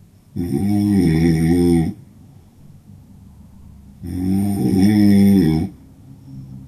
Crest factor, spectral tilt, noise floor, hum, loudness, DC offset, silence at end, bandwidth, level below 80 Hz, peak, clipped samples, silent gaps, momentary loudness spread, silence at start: 14 dB; -8 dB/octave; -45 dBFS; none; -16 LUFS; under 0.1%; 0 s; 13.5 kHz; -42 dBFS; -4 dBFS; under 0.1%; none; 20 LU; 0.35 s